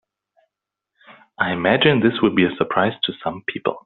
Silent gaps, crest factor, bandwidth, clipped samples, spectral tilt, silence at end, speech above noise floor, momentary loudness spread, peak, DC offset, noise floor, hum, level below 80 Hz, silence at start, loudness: none; 18 dB; 4.3 kHz; under 0.1%; -3.5 dB/octave; 0.05 s; 63 dB; 9 LU; -2 dBFS; under 0.1%; -82 dBFS; none; -58 dBFS; 1.1 s; -19 LUFS